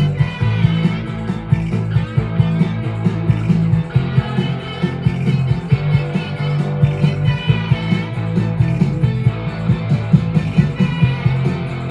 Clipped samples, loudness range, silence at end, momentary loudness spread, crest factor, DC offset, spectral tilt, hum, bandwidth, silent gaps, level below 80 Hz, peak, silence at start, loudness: under 0.1%; 1 LU; 0 s; 5 LU; 16 dB; under 0.1%; -8.5 dB/octave; none; 8 kHz; none; -36 dBFS; 0 dBFS; 0 s; -17 LUFS